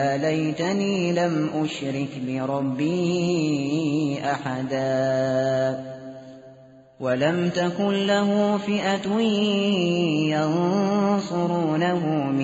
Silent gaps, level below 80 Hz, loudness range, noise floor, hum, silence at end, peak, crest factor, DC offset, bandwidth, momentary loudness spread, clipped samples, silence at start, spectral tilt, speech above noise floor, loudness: none; -64 dBFS; 3 LU; -49 dBFS; none; 0 s; -10 dBFS; 14 dB; under 0.1%; 8 kHz; 6 LU; under 0.1%; 0 s; -5 dB/octave; 26 dB; -23 LUFS